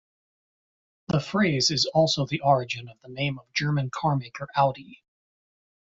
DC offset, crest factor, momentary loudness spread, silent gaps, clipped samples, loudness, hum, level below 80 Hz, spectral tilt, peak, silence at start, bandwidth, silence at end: under 0.1%; 20 dB; 9 LU; none; under 0.1%; -25 LUFS; none; -60 dBFS; -4.5 dB/octave; -8 dBFS; 1.1 s; 7.8 kHz; 0.95 s